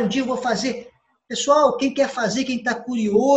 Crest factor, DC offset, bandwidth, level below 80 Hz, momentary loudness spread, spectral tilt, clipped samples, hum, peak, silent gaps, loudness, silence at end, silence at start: 16 dB; under 0.1%; 8.8 kHz; -60 dBFS; 9 LU; -4 dB/octave; under 0.1%; none; -4 dBFS; none; -21 LUFS; 0 s; 0 s